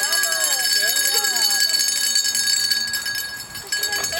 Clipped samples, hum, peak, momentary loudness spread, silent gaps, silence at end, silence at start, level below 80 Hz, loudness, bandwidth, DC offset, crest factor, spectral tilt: under 0.1%; none; -4 dBFS; 9 LU; none; 0 s; 0 s; -60 dBFS; -17 LUFS; 17.5 kHz; under 0.1%; 18 dB; 2.5 dB/octave